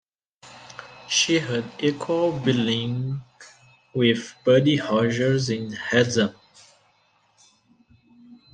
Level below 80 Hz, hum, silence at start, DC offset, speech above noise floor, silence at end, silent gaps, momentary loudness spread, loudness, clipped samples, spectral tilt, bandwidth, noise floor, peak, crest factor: -62 dBFS; none; 0.45 s; under 0.1%; 42 dB; 0.2 s; none; 13 LU; -22 LUFS; under 0.1%; -4.5 dB/octave; 10 kHz; -63 dBFS; -4 dBFS; 20 dB